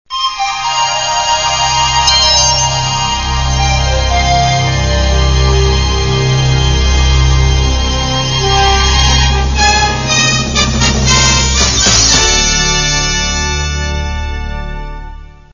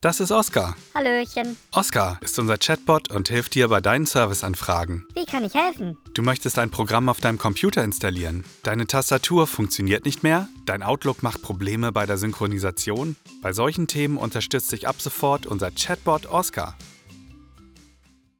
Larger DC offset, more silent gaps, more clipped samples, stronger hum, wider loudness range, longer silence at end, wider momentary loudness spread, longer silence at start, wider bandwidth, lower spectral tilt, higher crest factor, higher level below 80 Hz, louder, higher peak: first, 0.4% vs under 0.1%; neither; neither; neither; about the same, 3 LU vs 4 LU; second, 0.25 s vs 1.05 s; about the same, 8 LU vs 8 LU; about the same, 0.1 s vs 0 s; second, 7.4 kHz vs over 20 kHz; second, -2.5 dB/octave vs -4.5 dB/octave; second, 12 dB vs 18 dB; first, -16 dBFS vs -50 dBFS; first, -10 LUFS vs -23 LUFS; first, 0 dBFS vs -6 dBFS